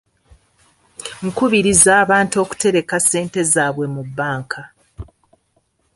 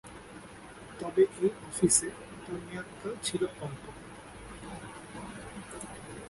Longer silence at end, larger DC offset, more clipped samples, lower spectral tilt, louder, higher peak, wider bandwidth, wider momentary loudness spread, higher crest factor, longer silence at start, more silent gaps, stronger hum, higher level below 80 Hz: first, 0.9 s vs 0 s; neither; neither; about the same, -3.5 dB/octave vs -4 dB/octave; first, -15 LUFS vs -31 LUFS; first, 0 dBFS vs -10 dBFS; about the same, 13 kHz vs 12 kHz; second, 16 LU vs 21 LU; second, 18 dB vs 24 dB; first, 1 s vs 0.05 s; neither; neither; first, -48 dBFS vs -58 dBFS